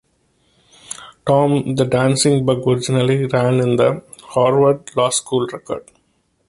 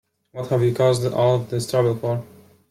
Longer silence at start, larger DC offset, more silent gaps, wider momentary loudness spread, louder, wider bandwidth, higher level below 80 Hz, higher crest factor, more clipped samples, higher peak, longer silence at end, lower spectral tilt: first, 0.9 s vs 0.35 s; neither; neither; first, 14 LU vs 10 LU; first, -17 LUFS vs -21 LUFS; second, 11.5 kHz vs 15.5 kHz; about the same, -52 dBFS vs -56 dBFS; about the same, 16 dB vs 14 dB; neither; first, -2 dBFS vs -8 dBFS; first, 0.7 s vs 0.45 s; about the same, -5.5 dB/octave vs -6.5 dB/octave